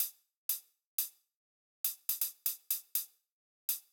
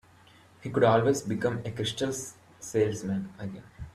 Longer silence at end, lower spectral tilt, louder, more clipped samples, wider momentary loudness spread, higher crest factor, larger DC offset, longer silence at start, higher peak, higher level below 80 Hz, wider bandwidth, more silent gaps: about the same, 0.1 s vs 0.05 s; second, 6 dB/octave vs -5.5 dB/octave; second, -36 LUFS vs -28 LUFS; neither; second, 6 LU vs 19 LU; about the same, 24 dB vs 20 dB; neither; second, 0 s vs 0.6 s; second, -16 dBFS vs -10 dBFS; second, under -90 dBFS vs -58 dBFS; first, over 20 kHz vs 14 kHz; first, 0.36-0.49 s, 0.85-0.98 s, 1.35-1.84 s, 3.32-3.68 s vs none